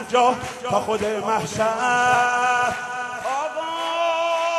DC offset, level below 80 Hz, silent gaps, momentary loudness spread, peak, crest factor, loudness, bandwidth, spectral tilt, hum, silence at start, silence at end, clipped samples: under 0.1%; -56 dBFS; none; 8 LU; -4 dBFS; 16 dB; -21 LUFS; 13 kHz; -3 dB/octave; none; 0 s; 0 s; under 0.1%